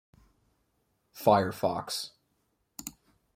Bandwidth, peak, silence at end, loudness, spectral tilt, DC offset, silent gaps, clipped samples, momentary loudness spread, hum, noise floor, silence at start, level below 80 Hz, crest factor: 16.5 kHz; -10 dBFS; 0.45 s; -28 LUFS; -4.5 dB/octave; under 0.1%; none; under 0.1%; 19 LU; none; -76 dBFS; 1.15 s; -68 dBFS; 24 dB